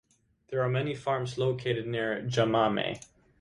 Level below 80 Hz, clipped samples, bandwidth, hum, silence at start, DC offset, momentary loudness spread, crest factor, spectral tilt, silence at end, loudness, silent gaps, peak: -62 dBFS; under 0.1%; 11 kHz; none; 0.5 s; under 0.1%; 7 LU; 20 dB; -6 dB/octave; 0.35 s; -30 LUFS; none; -12 dBFS